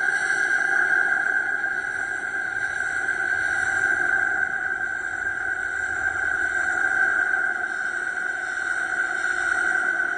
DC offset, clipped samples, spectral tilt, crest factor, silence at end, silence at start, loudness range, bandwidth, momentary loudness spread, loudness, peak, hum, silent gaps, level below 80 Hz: under 0.1%; under 0.1%; -2 dB/octave; 14 dB; 0 s; 0 s; 1 LU; 10 kHz; 6 LU; -23 LUFS; -10 dBFS; none; none; -58 dBFS